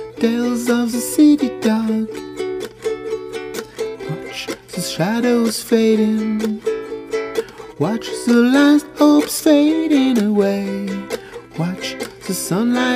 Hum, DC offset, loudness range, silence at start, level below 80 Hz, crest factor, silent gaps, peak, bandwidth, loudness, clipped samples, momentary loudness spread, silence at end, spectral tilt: none; under 0.1%; 8 LU; 0 s; -54 dBFS; 16 dB; none; -2 dBFS; 16 kHz; -18 LUFS; under 0.1%; 13 LU; 0 s; -5 dB/octave